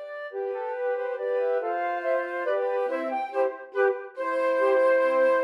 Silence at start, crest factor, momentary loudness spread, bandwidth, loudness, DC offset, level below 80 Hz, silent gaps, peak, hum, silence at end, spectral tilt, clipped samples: 0 s; 14 dB; 9 LU; 9.6 kHz; -26 LUFS; under 0.1%; under -90 dBFS; none; -12 dBFS; none; 0 s; -3 dB/octave; under 0.1%